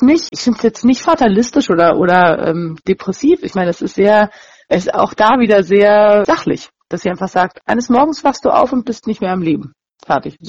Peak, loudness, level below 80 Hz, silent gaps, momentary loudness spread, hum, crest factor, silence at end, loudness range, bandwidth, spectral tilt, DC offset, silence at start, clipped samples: 0 dBFS; -13 LUFS; -46 dBFS; none; 9 LU; none; 12 dB; 0 s; 4 LU; 7.8 kHz; -5.5 dB/octave; under 0.1%; 0 s; under 0.1%